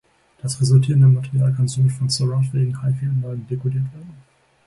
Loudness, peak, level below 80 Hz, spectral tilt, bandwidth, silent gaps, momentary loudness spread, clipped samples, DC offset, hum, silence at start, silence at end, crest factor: -19 LUFS; -4 dBFS; -54 dBFS; -6.5 dB/octave; 11.5 kHz; none; 12 LU; under 0.1%; under 0.1%; none; 0.45 s; 0.5 s; 16 dB